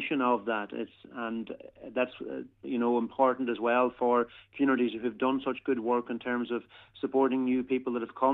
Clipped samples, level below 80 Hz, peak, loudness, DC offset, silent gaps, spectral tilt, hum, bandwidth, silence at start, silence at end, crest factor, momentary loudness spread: under 0.1%; -70 dBFS; -12 dBFS; -30 LUFS; under 0.1%; none; -8 dB/octave; none; 4.1 kHz; 0 s; 0 s; 18 dB; 11 LU